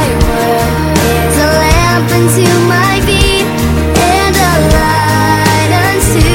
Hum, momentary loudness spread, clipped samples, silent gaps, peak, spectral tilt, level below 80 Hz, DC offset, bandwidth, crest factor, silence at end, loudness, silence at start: none; 3 LU; 0.3%; none; 0 dBFS; -4.5 dB/octave; -18 dBFS; under 0.1%; 17 kHz; 8 dB; 0 s; -9 LUFS; 0 s